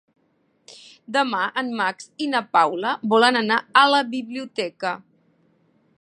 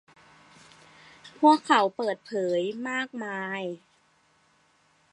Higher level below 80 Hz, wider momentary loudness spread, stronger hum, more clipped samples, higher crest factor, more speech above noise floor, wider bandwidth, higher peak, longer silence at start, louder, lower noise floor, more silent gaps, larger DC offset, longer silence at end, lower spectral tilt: about the same, -78 dBFS vs -80 dBFS; about the same, 13 LU vs 12 LU; neither; neither; about the same, 22 dB vs 22 dB; first, 45 dB vs 40 dB; about the same, 11 kHz vs 10.5 kHz; first, -2 dBFS vs -6 dBFS; second, 0.7 s vs 1.25 s; first, -21 LUFS vs -26 LUFS; about the same, -66 dBFS vs -65 dBFS; neither; neither; second, 1 s vs 1.35 s; about the same, -3.5 dB/octave vs -4.5 dB/octave